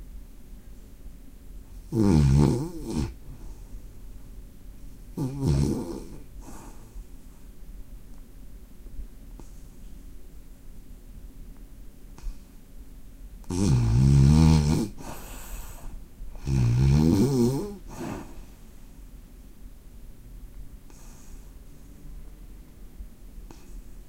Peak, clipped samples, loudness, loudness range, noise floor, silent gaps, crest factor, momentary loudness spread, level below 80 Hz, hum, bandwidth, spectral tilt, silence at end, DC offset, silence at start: -8 dBFS; under 0.1%; -24 LUFS; 25 LU; -45 dBFS; none; 20 dB; 28 LU; -36 dBFS; none; 16 kHz; -7.5 dB/octave; 0 s; under 0.1%; 0 s